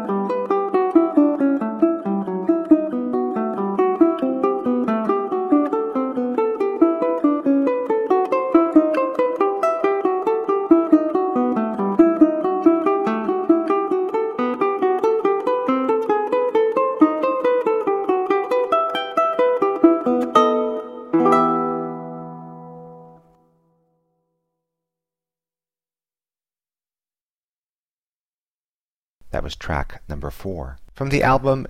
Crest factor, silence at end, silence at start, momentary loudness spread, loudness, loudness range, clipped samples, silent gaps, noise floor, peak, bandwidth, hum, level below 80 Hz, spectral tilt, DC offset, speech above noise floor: 18 dB; 0 s; 0 s; 11 LU; -19 LUFS; 9 LU; under 0.1%; 27.21-29.21 s; under -90 dBFS; -2 dBFS; 9.8 kHz; none; -44 dBFS; -7.5 dB/octave; under 0.1%; over 70 dB